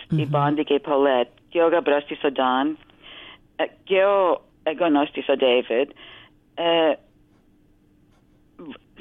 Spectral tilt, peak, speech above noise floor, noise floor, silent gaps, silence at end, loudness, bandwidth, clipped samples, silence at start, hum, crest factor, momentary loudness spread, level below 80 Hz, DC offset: -8.5 dB/octave; -6 dBFS; 37 dB; -58 dBFS; none; 0.25 s; -22 LUFS; 4.1 kHz; under 0.1%; 0 s; none; 16 dB; 21 LU; -62 dBFS; under 0.1%